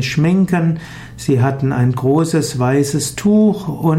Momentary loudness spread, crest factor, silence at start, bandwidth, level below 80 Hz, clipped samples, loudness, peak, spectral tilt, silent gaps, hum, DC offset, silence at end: 6 LU; 12 dB; 0 s; 16 kHz; -44 dBFS; under 0.1%; -16 LUFS; -4 dBFS; -6.5 dB/octave; none; none; under 0.1%; 0 s